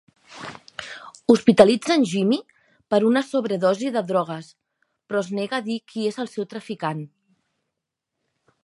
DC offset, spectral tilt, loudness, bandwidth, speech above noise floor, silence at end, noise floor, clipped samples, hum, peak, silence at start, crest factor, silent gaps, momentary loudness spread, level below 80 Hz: under 0.1%; -5.5 dB/octave; -22 LUFS; 11.5 kHz; 62 dB; 1.6 s; -82 dBFS; under 0.1%; none; 0 dBFS; 0.3 s; 24 dB; none; 20 LU; -66 dBFS